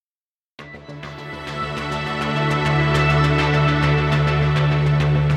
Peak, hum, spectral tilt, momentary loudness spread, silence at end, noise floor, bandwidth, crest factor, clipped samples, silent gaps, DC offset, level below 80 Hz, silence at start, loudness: -6 dBFS; none; -7 dB/octave; 17 LU; 0 s; under -90 dBFS; 9 kHz; 14 dB; under 0.1%; none; under 0.1%; -34 dBFS; 0.6 s; -19 LUFS